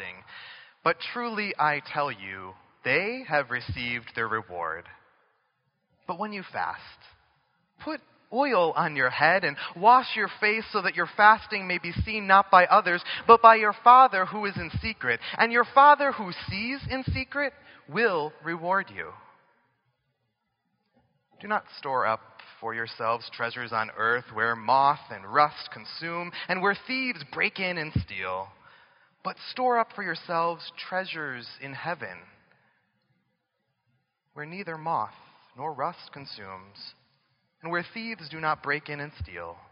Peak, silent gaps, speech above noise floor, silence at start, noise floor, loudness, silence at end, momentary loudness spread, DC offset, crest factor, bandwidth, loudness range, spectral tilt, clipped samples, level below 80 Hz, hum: 0 dBFS; none; 52 dB; 0 s; -78 dBFS; -25 LUFS; 0.15 s; 20 LU; under 0.1%; 26 dB; 5.4 kHz; 17 LU; -2 dB/octave; under 0.1%; -54 dBFS; none